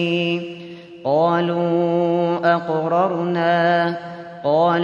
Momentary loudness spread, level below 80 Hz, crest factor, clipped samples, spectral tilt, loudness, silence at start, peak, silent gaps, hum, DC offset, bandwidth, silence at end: 12 LU; -68 dBFS; 14 dB; under 0.1%; -7.5 dB/octave; -19 LUFS; 0 s; -4 dBFS; none; none; under 0.1%; 7 kHz; 0 s